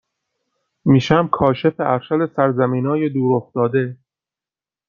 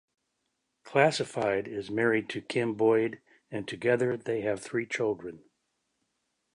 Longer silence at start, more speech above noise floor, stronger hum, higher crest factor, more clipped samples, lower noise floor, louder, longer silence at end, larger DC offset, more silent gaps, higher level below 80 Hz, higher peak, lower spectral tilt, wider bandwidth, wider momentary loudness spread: about the same, 0.85 s vs 0.85 s; first, over 73 dB vs 51 dB; neither; about the same, 18 dB vs 22 dB; neither; first, under -90 dBFS vs -80 dBFS; first, -18 LUFS vs -29 LUFS; second, 0.95 s vs 1.2 s; neither; neither; first, -52 dBFS vs -70 dBFS; first, -2 dBFS vs -8 dBFS; first, -8 dB/octave vs -5.5 dB/octave; second, 7.2 kHz vs 11 kHz; second, 6 LU vs 12 LU